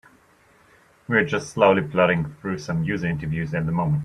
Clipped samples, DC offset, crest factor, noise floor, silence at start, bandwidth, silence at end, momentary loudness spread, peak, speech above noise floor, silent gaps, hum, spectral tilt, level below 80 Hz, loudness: under 0.1%; under 0.1%; 20 dB; -57 dBFS; 1.1 s; 10 kHz; 0 s; 8 LU; -2 dBFS; 35 dB; none; none; -7 dB/octave; -50 dBFS; -22 LUFS